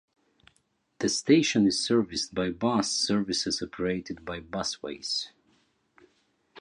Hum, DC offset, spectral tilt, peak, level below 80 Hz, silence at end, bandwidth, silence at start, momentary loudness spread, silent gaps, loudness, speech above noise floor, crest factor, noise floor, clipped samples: none; under 0.1%; -4 dB/octave; -8 dBFS; -60 dBFS; 0 s; 11 kHz; 1 s; 12 LU; none; -27 LUFS; 44 dB; 20 dB; -72 dBFS; under 0.1%